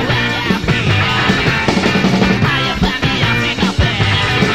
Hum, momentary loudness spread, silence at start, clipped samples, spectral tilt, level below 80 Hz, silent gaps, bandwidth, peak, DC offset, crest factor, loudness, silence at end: none; 2 LU; 0 s; under 0.1%; -5 dB/octave; -28 dBFS; none; 15 kHz; 0 dBFS; 0.9%; 14 dB; -13 LUFS; 0 s